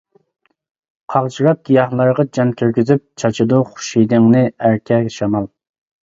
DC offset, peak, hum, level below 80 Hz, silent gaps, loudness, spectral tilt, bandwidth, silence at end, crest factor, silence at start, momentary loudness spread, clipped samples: under 0.1%; 0 dBFS; none; -54 dBFS; none; -15 LUFS; -7 dB/octave; 7.8 kHz; 0.55 s; 16 dB; 1.1 s; 7 LU; under 0.1%